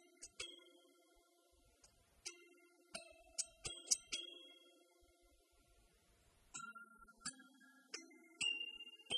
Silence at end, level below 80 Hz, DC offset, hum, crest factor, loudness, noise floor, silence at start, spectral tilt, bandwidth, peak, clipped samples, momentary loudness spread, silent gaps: 0 s; -78 dBFS; under 0.1%; none; 34 dB; -46 LUFS; -74 dBFS; 0 s; 1 dB/octave; 12 kHz; -18 dBFS; under 0.1%; 24 LU; none